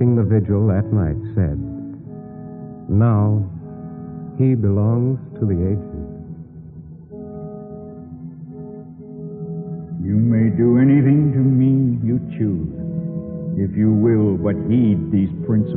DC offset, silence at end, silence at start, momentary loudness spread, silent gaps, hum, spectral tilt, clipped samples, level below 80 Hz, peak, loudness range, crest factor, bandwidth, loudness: under 0.1%; 0 s; 0 s; 20 LU; none; none; -12 dB/octave; under 0.1%; -42 dBFS; -4 dBFS; 15 LU; 14 dB; 3.4 kHz; -18 LUFS